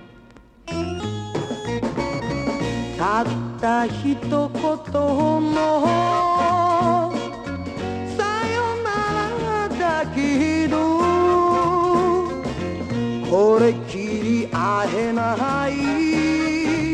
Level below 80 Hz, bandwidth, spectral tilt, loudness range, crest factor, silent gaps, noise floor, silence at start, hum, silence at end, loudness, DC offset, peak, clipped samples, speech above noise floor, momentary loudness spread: -44 dBFS; 10.5 kHz; -6 dB/octave; 4 LU; 16 dB; none; -47 dBFS; 0 s; none; 0 s; -21 LUFS; under 0.1%; -6 dBFS; under 0.1%; 28 dB; 9 LU